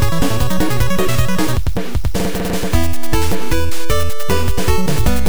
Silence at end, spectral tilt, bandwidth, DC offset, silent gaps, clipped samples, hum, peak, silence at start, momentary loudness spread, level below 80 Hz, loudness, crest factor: 0 s; -5 dB/octave; over 20 kHz; 30%; none; under 0.1%; none; 0 dBFS; 0 s; 3 LU; -22 dBFS; -19 LUFS; 14 dB